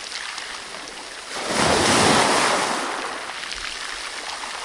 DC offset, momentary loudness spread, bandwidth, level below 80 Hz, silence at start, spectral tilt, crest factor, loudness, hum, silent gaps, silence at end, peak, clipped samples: under 0.1%; 16 LU; 11.5 kHz; -50 dBFS; 0 s; -2 dB/octave; 20 dB; -21 LUFS; none; none; 0 s; -4 dBFS; under 0.1%